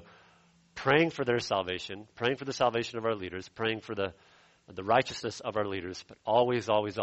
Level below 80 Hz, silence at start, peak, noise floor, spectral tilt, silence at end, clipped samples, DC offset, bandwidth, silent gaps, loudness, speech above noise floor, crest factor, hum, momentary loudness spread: -64 dBFS; 0 s; -10 dBFS; -63 dBFS; -5 dB/octave; 0 s; under 0.1%; under 0.1%; 8.2 kHz; none; -30 LUFS; 33 dB; 22 dB; none; 13 LU